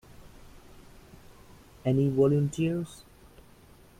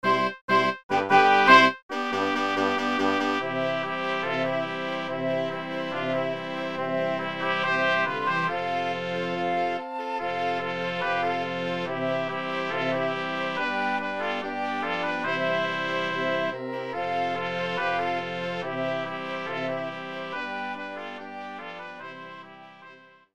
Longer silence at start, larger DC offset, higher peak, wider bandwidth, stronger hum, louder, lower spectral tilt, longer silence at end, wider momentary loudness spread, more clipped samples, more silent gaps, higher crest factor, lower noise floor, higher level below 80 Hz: first, 0.25 s vs 0.05 s; second, under 0.1% vs 0.3%; second, -12 dBFS vs -2 dBFS; first, 14.5 kHz vs 13 kHz; neither; about the same, -27 LUFS vs -26 LUFS; first, -8 dB/octave vs -5 dB/octave; first, 1.05 s vs 0.1 s; first, 15 LU vs 10 LU; neither; second, none vs 0.41-0.48 s, 0.83-0.89 s, 1.82-1.89 s; second, 18 dB vs 24 dB; first, -55 dBFS vs -51 dBFS; first, -56 dBFS vs -72 dBFS